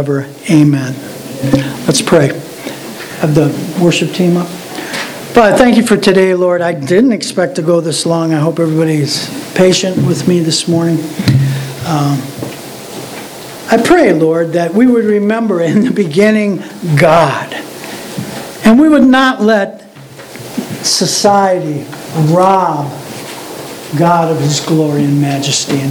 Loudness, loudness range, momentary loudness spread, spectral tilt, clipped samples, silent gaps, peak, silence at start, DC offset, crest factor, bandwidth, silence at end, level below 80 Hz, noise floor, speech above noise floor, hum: -11 LUFS; 3 LU; 16 LU; -5.5 dB/octave; 0.4%; none; 0 dBFS; 0 s; under 0.1%; 12 dB; over 20 kHz; 0 s; -46 dBFS; -32 dBFS; 22 dB; none